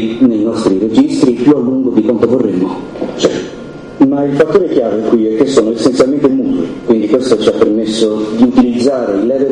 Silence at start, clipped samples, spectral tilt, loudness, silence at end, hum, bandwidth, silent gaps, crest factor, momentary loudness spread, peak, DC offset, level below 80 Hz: 0 s; 0.3%; -6 dB/octave; -12 LUFS; 0 s; none; 10.5 kHz; none; 12 dB; 5 LU; 0 dBFS; under 0.1%; -44 dBFS